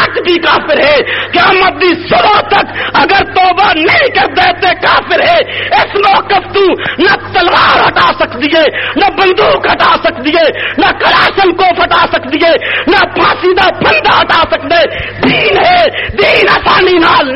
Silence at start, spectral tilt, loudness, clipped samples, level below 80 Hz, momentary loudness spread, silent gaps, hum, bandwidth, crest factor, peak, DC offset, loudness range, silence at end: 0 s; -6 dB/octave; -7 LUFS; under 0.1%; -34 dBFS; 4 LU; none; none; 7.4 kHz; 8 dB; 0 dBFS; 0.7%; 1 LU; 0 s